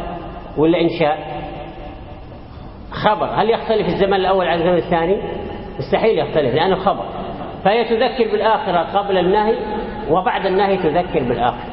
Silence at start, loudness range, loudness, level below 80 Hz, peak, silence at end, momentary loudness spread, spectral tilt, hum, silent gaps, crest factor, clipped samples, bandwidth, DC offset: 0 s; 3 LU; -18 LUFS; -38 dBFS; 0 dBFS; 0 s; 15 LU; -11 dB/octave; none; none; 18 dB; under 0.1%; 5.8 kHz; under 0.1%